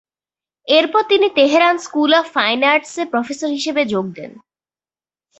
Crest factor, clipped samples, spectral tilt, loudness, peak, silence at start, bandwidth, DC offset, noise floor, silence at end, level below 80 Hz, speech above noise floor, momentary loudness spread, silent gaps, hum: 16 dB; under 0.1%; -3.5 dB/octave; -15 LUFS; -2 dBFS; 0.65 s; 8.2 kHz; under 0.1%; under -90 dBFS; 1 s; -64 dBFS; over 74 dB; 10 LU; none; none